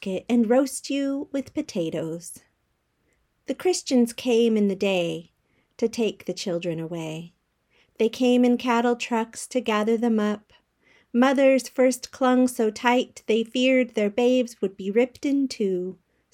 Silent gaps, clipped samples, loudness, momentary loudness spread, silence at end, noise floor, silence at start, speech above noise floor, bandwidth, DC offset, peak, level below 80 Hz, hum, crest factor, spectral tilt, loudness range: none; under 0.1%; -24 LUFS; 11 LU; 0.4 s; -72 dBFS; 0 s; 49 dB; 15.5 kHz; under 0.1%; -6 dBFS; -68 dBFS; none; 18 dB; -4.5 dB/octave; 6 LU